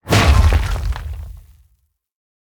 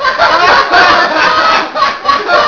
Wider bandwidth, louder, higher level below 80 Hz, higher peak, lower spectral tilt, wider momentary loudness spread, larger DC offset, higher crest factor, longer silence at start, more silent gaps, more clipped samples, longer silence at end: first, 19 kHz vs 5.4 kHz; second, -16 LUFS vs -8 LUFS; first, -20 dBFS vs -40 dBFS; about the same, 0 dBFS vs 0 dBFS; first, -5 dB/octave vs -2.5 dB/octave; first, 20 LU vs 6 LU; neither; first, 16 dB vs 8 dB; about the same, 0.05 s vs 0 s; neither; second, under 0.1% vs 1%; first, 1.1 s vs 0 s